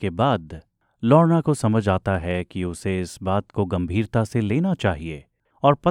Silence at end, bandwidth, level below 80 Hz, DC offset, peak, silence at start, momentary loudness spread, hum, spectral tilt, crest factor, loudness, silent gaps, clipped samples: 0 s; 12 kHz; -46 dBFS; under 0.1%; -2 dBFS; 0 s; 11 LU; none; -7.5 dB/octave; 20 dB; -22 LUFS; none; under 0.1%